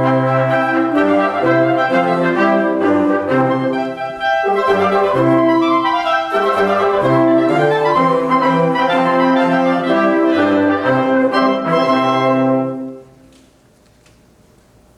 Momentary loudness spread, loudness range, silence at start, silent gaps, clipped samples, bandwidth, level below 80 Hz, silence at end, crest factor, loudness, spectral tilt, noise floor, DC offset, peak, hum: 3 LU; 3 LU; 0 s; none; under 0.1%; 12 kHz; -56 dBFS; 1.95 s; 12 dB; -14 LUFS; -7 dB/octave; -50 dBFS; under 0.1%; -2 dBFS; none